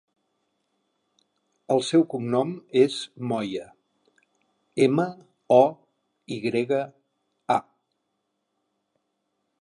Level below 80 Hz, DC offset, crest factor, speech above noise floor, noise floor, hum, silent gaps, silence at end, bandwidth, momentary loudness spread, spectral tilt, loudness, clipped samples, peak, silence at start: -76 dBFS; under 0.1%; 22 dB; 55 dB; -77 dBFS; none; none; 2 s; 11 kHz; 14 LU; -6 dB/octave; -24 LUFS; under 0.1%; -4 dBFS; 1.7 s